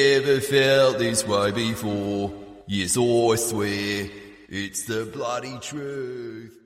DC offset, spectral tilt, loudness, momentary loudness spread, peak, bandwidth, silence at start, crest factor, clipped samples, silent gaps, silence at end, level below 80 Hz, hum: under 0.1%; -4 dB/octave; -23 LUFS; 15 LU; -6 dBFS; 16 kHz; 0 s; 16 dB; under 0.1%; none; 0.15 s; -56 dBFS; none